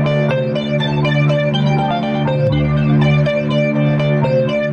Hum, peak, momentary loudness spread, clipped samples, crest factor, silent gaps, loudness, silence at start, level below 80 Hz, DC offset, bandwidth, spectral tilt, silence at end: none; -4 dBFS; 4 LU; under 0.1%; 10 dB; none; -15 LUFS; 0 s; -38 dBFS; under 0.1%; 6.8 kHz; -8 dB/octave; 0 s